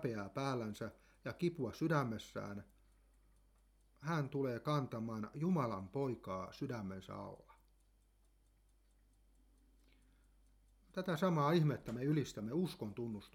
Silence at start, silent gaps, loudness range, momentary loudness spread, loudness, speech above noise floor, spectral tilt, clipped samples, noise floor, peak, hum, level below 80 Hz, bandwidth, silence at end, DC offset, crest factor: 0 s; none; 12 LU; 14 LU; -40 LUFS; 32 dB; -7 dB/octave; under 0.1%; -72 dBFS; -22 dBFS; none; -70 dBFS; 15.5 kHz; 0.05 s; under 0.1%; 20 dB